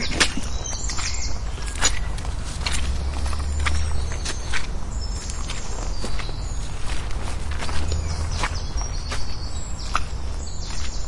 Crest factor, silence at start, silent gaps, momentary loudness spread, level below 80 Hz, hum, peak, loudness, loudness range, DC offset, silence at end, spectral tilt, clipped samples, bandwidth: 20 dB; 0 s; none; 9 LU; -28 dBFS; none; -2 dBFS; -28 LUFS; 4 LU; under 0.1%; 0 s; -3 dB/octave; under 0.1%; 11.5 kHz